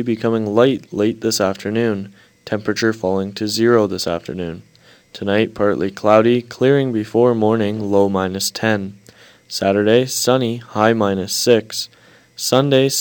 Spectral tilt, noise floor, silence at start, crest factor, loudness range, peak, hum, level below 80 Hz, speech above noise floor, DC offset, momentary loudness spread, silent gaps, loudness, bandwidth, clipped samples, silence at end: -4.5 dB/octave; -47 dBFS; 0 s; 18 dB; 3 LU; 0 dBFS; none; -58 dBFS; 30 dB; under 0.1%; 11 LU; none; -17 LUFS; 19 kHz; under 0.1%; 0 s